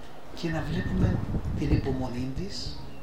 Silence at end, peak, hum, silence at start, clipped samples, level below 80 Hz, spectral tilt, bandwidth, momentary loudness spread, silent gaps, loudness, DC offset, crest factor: 0 s; -10 dBFS; none; 0 s; under 0.1%; -38 dBFS; -7 dB/octave; 15 kHz; 9 LU; none; -30 LUFS; 2%; 18 dB